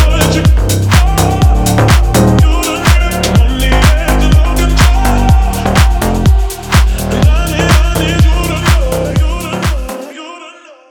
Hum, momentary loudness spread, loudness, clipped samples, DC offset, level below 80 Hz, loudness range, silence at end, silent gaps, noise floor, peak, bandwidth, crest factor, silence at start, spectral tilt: none; 7 LU; -11 LUFS; under 0.1%; under 0.1%; -12 dBFS; 2 LU; 0.4 s; none; -34 dBFS; 0 dBFS; 19 kHz; 8 dB; 0 s; -5 dB/octave